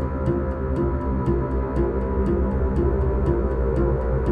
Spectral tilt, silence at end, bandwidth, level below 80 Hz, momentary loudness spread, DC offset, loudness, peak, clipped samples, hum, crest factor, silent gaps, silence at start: -11 dB/octave; 0 s; 3.2 kHz; -26 dBFS; 2 LU; under 0.1%; -23 LUFS; -8 dBFS; under 0.1%; none; 14 dB; none; 0 s